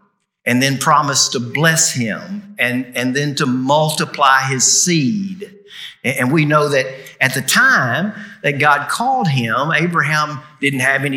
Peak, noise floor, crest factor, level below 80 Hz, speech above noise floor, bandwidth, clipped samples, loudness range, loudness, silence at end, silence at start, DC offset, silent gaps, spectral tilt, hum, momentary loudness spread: 0 dBFS; -36 dBFS; 16 dB; -70 dBFS; 20 dB; 19 kHz; under 0.1%; 1 LU; -15 LUFS; 0 s; 0.45 s; under 0.1%; none; -3.5 dB/octave; none; 11 LU